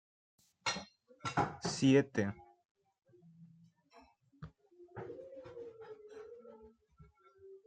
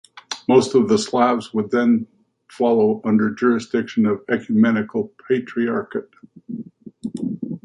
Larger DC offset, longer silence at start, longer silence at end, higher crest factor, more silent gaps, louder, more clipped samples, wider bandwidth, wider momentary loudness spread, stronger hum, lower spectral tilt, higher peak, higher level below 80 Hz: neither; first, 0.65 s vs 0.15 s; about the same, 0.1 s vs 0.05 s; first, 24 dB vs 18 dB; first, 2.65-2.75 s vs none; second, -35 LUFS vs -19 LUFS; neither; second, 9.4 kHz vs 10.5 kHz; first, 26 LU vs 15 LU; neither; about the same, -5 dB/octave vs -6 dB/octave; second, -16 dBFS vs -2 dBFS; second, -72 dBFS vs -62 dBFS